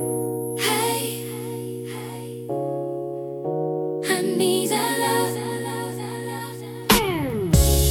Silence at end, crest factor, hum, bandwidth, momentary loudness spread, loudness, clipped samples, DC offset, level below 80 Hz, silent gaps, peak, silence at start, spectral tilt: 0 s; 22 dB; none; 18 kHz; 13 LU; -24 LUFS; under 0.1%; under 0.1%; -32 dBFS; none; -2 dBFS; 0 s; -4 dB/octave